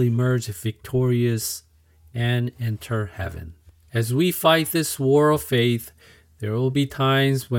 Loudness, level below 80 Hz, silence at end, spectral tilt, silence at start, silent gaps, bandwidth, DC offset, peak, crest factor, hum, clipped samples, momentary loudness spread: -22 LUFS; -52 dBFS; 0 s; -5.5 dB/octave; 0 s; none; 18 kHz; under 0.1%; -4 dBFS; 18 dB; none; under 0.1%; 13 LU